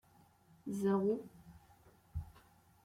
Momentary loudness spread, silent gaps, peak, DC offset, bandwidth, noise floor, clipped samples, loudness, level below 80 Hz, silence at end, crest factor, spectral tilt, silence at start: 23 LU; none; -24 dBFS; under 0.1%; 15.5 kHz; -67 dBFS; under 0.1%; -38 LUFS; -60 dBFS; 0.55 s; 18 dB; -8 dB/octave; 0.65 s